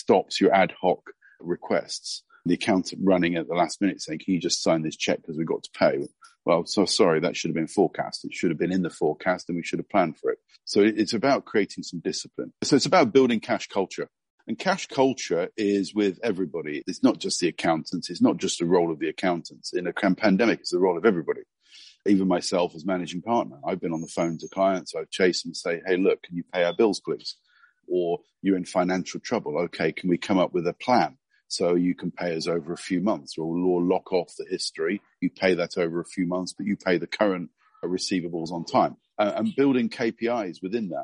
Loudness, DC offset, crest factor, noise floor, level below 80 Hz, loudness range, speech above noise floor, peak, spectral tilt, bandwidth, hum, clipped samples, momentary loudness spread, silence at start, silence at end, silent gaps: -25 LUFS; under 0.1%; 20 dB; -52 dBFS; -68 dBFS; 3 LU; 27 dB; -6 dBFS; -5 dB/octave; 10.5 kHz; none; under 0.1%; 10 LU; 0.1 s; 0 s; 14.30-14.38 s